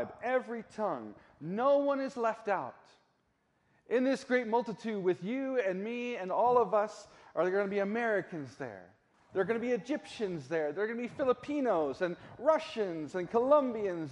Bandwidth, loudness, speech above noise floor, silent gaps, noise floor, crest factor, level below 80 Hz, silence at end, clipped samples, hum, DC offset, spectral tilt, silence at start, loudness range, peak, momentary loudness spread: 11 kHz; -33 LUFS; 43 dB; none; -75 dBFS; 18 dB; -74 dBFS; 0 s; under 0.1%; none; under 0.1%; -6 dB/octave; 0 s; 3 LU; -14 dBFS; 12 LU